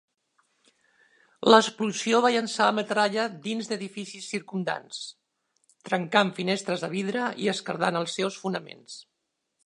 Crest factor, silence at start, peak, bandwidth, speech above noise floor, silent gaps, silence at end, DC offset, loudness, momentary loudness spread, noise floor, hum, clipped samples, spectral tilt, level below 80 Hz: 26 dB; 1.4 s; -2 dBFS; 11 kHz; 54 dB; none; 0.65 s; under 0.1%; -26 LUFS; 16 LU; -80 dBFS; none; under 0.1%; -4 dB/octave; -78 dBFS